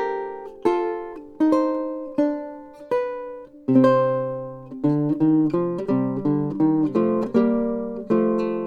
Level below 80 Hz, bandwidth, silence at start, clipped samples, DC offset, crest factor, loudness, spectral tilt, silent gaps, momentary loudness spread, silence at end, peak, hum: -56 dBFS; 6.8 kHz; 0 s; under 0.1%; under 0.1%; 16 dB; -22 LUFS; -9.5 dB/octave; none; 13 LU; 0 s; -6 dBFS; none